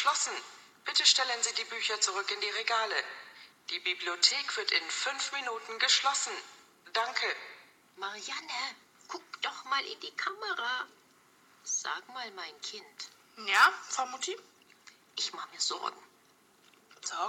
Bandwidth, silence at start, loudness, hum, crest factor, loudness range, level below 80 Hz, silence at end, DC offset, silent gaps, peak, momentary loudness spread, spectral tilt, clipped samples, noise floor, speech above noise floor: 17.5 kHz; 0 s; -31 LUFS; none; 26 dB; 8 LU; under -90 dBFS; 0 s; under 0.1%; none; -8 dBFS; 19 LU; 2.5 dB/octave; under 0.1%; -64 dBFS; 31 dB